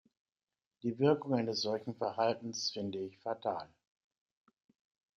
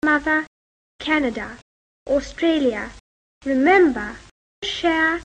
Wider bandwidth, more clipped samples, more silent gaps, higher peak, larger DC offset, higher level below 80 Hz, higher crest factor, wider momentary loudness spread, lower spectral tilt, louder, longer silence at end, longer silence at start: second, 7.6 kHz vs 9.4 kHz; neither; second, none vs 0.47-0.99 s, 1.62-2.06 s, 3.00-3.41 s, 4.31-4.62 s; second, -14 dBFS vs -4 dBFS; neither; second, -80 dBFS vs -48 dBFS; about the same, 22 dB vs 18 dB; second, 10 LU vs 19 LU; about the same, -5 dB/octave vs -4 dB/octave; second, -35 LUFS vs -20 LUFS; first, 1.5 s vs 0 s; first, 0.85 s vs 0.05 s